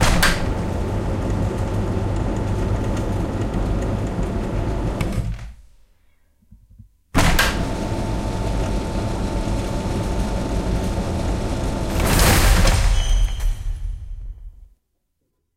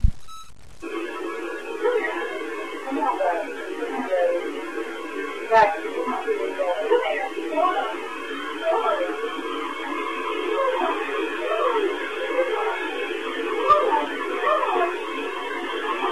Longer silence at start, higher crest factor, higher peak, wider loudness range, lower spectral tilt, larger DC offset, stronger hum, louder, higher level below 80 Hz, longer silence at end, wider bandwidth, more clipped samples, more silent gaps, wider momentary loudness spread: about the same, 0 s vs 0 s; about the same, 18 dB vs 18 dB; first, -2 dBFS vs -6 dBFS; about the same, 5 LU vs 4 LU; about the same, -5 dB/octave vs -5 dB/octave; second, under 0.1% vs 0.7%; neither; first, -22 LUFS vs -25 LUFS; first, -24 dBFS vs -38 dBFS; first, 0.9 s vs 0 s; first, 16 kHz vs 14.5 kHz; neither; neither; about the same, 11 LU vs 10 LU